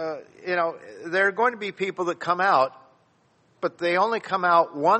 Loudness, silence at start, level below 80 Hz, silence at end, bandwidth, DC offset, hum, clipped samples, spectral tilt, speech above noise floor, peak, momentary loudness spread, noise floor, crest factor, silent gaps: -24 LUFS; 0 s; -76 dBFS; 0 s; 8.4 kHz; under 0.1%; none; under 0.1%; -5 dB/octave; 40 dB; -6 dBFS; 11 LU; -63 dBFS; 18 dB; none